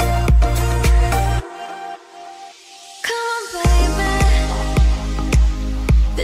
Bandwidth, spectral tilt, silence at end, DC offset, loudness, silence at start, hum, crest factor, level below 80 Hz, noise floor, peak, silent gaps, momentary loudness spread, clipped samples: 15.5 kHz; -5.5 dB/octave; 0 s; under 0.1%; -18 LUFS; 0 s; none; 12 dB; -18 dBFS; -40 dBFS; -4 dBFS; none; 20 LU; under 0.1%